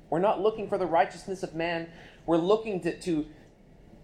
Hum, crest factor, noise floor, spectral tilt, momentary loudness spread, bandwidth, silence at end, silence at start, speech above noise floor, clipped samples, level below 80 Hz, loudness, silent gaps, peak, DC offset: none; 18 dB; -54 dBFS; -6 dB/octave; 11 LU; 10.5 kHz; 0.7 s; 0.1 s; 26 dB; under 0.1%; -58 dBFS; -28 LUFS; none; -12 dBFS; under 0.1%